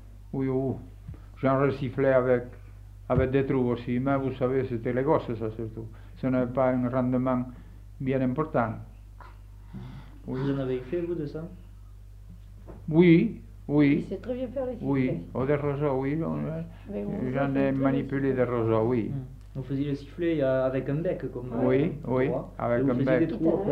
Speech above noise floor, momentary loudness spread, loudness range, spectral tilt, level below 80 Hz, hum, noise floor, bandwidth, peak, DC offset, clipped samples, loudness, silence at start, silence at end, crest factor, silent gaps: 20 dB; 17 LU; 6 LU; -10 dB/octave; -46 dBFS; none; -46 dBFS; 5.6 kHz; -8 dBFS; under 0.1%; under 0.1%; -27 LUFS; 0 s; 0 s; 20 dB; none